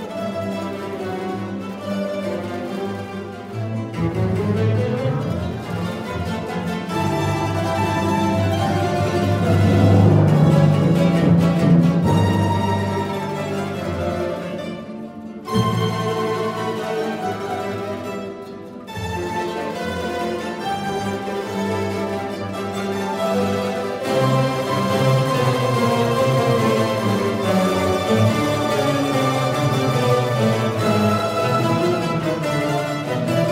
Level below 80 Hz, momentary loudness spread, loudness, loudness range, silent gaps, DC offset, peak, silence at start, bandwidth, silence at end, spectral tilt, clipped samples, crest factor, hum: -46 dBFS; 11 LU; -20 LUFS; 10 LU; none; under 0.1%; -4 dBFS; 0 s; 16 kHz; 0 s; -6.5 dB/octave; under 0.1%; 16 dB; none